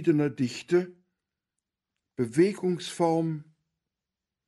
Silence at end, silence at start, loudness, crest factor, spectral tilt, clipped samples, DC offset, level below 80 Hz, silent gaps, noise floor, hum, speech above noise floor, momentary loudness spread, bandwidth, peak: 1.05 s; 0 s; -27 LUFS; 18 dB; -6.5 dB/octave; under 0.1%; under 0.1%; -72 dBFS; none; -88 dBFS; none; 62 dB; 12 LU; 11.5 kHz; -12 dBFS